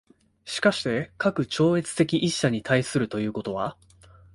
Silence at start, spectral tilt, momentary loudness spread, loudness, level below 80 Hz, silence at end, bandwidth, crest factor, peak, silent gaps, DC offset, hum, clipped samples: 0.45 s; -5 dB/octave; 8 LU; -25 LUFS; -58 dBFS; 0.6 s; 11.5 kHz; 18 dB; -8 dBFS; none; under 0.1%; none; under 0.1%